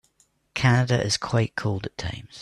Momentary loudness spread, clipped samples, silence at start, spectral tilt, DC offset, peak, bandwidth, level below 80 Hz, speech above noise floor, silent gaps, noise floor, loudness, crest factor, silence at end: 13 LU; under 0.1%; 0.55 s; -5 dB/octave; under 0.1%; -8 dBFS; 11.5 kHz; -50 dBFS; 42 dB; none; -65 dBFS; -24 LUFS; 18 dB; 0 s